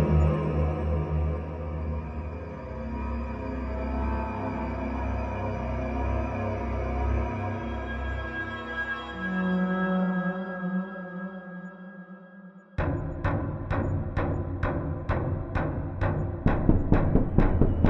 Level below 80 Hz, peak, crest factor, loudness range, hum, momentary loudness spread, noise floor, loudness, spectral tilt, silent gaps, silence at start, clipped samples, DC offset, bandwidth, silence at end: -34 dBFS; -4 dBFS; 24 dB; 5 LU; none; 12 LU; -48 dBFS; -30 LUFS; -9.5 dB/octave; none; 0 s; under 0.1%; under 0.1%; 6.2 kHz; 0 s